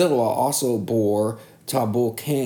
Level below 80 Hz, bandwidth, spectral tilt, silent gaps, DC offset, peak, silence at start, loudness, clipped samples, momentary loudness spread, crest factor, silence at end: -68 dBFS; 19.5 kHz; -5.5 dB/octave; none; under 0.1%; -8 dBFS; 0 s; -22 LUFS; under 0.1%; 6 LU; 14 dB; 0 s